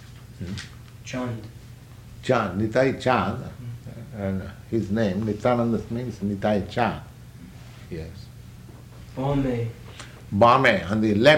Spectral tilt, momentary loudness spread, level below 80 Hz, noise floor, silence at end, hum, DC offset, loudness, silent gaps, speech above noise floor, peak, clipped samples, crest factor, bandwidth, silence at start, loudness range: -6.5 dB/octave; 24 LU; -48 dBFS; -44 dBFS; 0 s; none; under 0.1%; -24 LUFS; none; 21 dB; -4 dBFS; under 0.1%; 20 dB; 16.5 kHz; 0 s; 6 LU